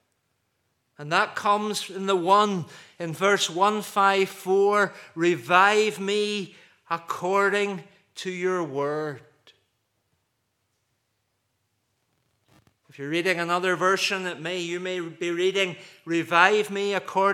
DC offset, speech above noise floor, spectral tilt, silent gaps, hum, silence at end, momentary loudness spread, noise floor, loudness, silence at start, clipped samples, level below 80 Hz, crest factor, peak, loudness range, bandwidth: under 0.1%; 51 dB; -4 dB/octave; none; none; 0 s; 13 LU; -75 dBFS; -24 LUFS; 1 s; under 0.1%; -84 dBFS; 24 dB; -2 dBFS; 11 LU; 15.5 kHz